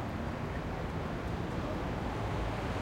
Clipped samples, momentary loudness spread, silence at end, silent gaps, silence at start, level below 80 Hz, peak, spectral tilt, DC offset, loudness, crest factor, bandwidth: under 0.1%; 2 LU; 0 s; none; 0 s; -44 dBFS; -22 dBFS; -7 dB/octave; under 0.1%; -37 LUFS; 12 dB; 16.5 kHz